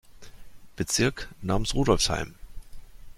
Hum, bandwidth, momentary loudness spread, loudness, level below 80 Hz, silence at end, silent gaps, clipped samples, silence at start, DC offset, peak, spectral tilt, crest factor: none; 16 kHz; 12 LU; -26 LUFS; -38 dBFS; 0.05 s; none; under 0.1%; 0.1 s; under 0.1%; -6 dBFS; -4 dB/octave; 22 dB